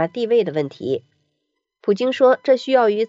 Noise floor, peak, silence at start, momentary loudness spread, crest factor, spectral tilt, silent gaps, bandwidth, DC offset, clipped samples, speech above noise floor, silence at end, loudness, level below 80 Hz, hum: -75 dBFS; -4 dBFS; 0 s; 10 LU; 16 dB; -6 dB/octave; none; 7.8 kHz; under 0.1%; under 0.1%; 58 dB; 0 s; -19 LUFS; -76 dBFS; none